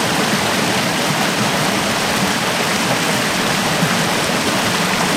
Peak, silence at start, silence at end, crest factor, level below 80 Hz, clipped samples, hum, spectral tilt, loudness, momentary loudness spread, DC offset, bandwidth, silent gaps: -4 dBFS; 0 s; 0 s; 14 dB; -46 dBFS; under 0.1%; none; -3 dB/octave; -16 LUFS; 1 LU; under 0.1%; 16 kHz; none